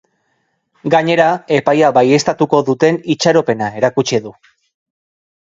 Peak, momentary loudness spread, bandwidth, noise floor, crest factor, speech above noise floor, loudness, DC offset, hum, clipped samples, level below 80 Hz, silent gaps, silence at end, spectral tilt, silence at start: 0 dBFS; 7 LU; 7.8 kHz; -65 dBFS; 14 dB; 52 dB; -13 LUFS; under 0.1%; none; under 0.1%; -58 dBFS; none; 1.2 s; -5 dB/octave; 0.85 s